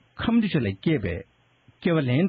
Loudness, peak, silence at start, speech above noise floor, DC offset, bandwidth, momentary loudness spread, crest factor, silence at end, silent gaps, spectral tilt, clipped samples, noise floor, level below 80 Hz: -25 LUFS; -10 dBFS; 0.2 s; 37 dB; under 0.1%; 5 kHz; 9 LU; 14 dB; 0 s; none; -6.5 dB/octave; under 0.1%; -60 dBFS; -50 dBFS